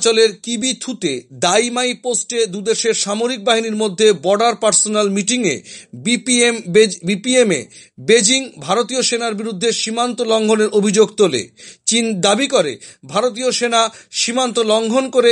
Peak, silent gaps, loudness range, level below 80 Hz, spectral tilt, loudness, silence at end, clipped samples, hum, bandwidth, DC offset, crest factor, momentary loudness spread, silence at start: 0 dBFS; none; 2 LU; -66 dBFS; -2.5 dB/octave; -16 LUFS; 0 s; under 0.1%; none; 11.5 kHz; under 0.1%; 16 dB; 8 LU; 0 s